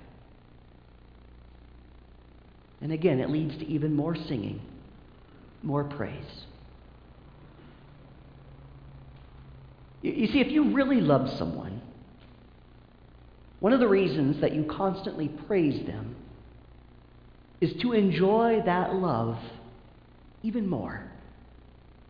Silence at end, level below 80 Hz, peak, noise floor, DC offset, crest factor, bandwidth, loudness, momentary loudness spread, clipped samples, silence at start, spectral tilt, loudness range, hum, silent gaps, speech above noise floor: 0.2 s; -54 dBFS; -8 dBFS; -53 dBFS; under 0.1%; 22 dB; 5.2 kHz; -27 LUFS; 24 LU; under 0.1%; 0 s; -9.5 dB/octave; 11 LU; none; none; 27 dB